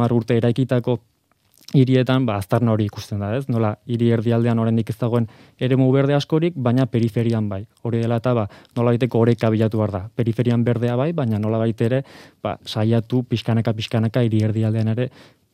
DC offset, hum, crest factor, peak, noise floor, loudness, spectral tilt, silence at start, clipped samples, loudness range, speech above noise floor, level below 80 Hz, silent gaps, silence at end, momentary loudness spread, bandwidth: under 0.1%; none; 16 dB; -4 dBFS; -59 dBFS; -20 LUFS; -8.5 dB/octave; 0 s; under 0.1%; 2 LU; 40 dB; -60 dBFS; none; 0.45 s; 8 LU; 12.5 kHz